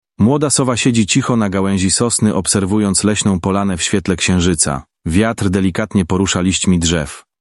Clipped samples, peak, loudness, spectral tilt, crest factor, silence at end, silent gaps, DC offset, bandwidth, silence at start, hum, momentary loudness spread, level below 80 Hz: under 0.1%; 0 dBFS; -15 LUFS; -4.5 dB/octave; 14 dB; 0.2 s; none; under 0.1%; 12 kHz; 0.2 s; none; 4 LU; -40 dBFS